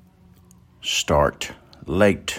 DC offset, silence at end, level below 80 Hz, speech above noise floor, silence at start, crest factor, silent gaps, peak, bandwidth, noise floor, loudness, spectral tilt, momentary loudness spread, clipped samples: under 0.1%; 0 s; -42 dBFS; 31 dB; 0.85 s; 20 dB; none; -4 dBFS; 16 kHz; -52 dBFS; -22 LUFS; -4 dB/octave; 14 LU; under 0.1%